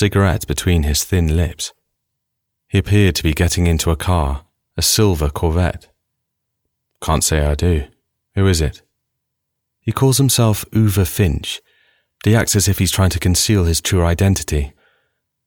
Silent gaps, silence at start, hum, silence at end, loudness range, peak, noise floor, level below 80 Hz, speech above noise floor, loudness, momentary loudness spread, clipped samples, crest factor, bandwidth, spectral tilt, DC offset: none; 0 s; none; 0.75 s; 4 LU; -4 dBFS; -76 dBFS; -28 dBFS; 61 dB; -17 LUFS; 11 LU; under 0.1%; 14 dB; 19.5 kHz; -4.5 dB/octave; 0.4%